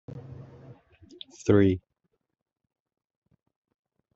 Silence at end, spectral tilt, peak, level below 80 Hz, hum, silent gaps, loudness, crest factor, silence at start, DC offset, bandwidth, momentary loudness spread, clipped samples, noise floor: 2.35 s; -7.5 dB/octave; -8 dBFS; -64 dBFS; none; none; -25 LUFS; 24 dB; 0.15 s; under 0.1%; 7.8 kHz; 25 LU; under 0.1%; -78 dBFS